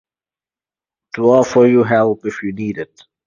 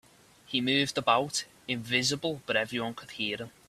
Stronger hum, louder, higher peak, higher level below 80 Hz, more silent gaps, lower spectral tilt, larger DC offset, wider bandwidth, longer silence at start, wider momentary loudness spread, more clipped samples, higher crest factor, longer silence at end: neither; first, -15 LUFS vs -29 LUFS; first, 0 dBFS vs -10 dBFS; first, -56 dBFS vs -68 dBFS; neither; first, -7 dB/octave vs -3 dB/octave; neither; second, 7.4 kHz vs 14.5 kHz; first, 1.15 s vs 0.5 s; first, 17 LU vs 9 LU; neither; second, 16 dB vs 22 dB; first, 0.4 s vs 0.2 s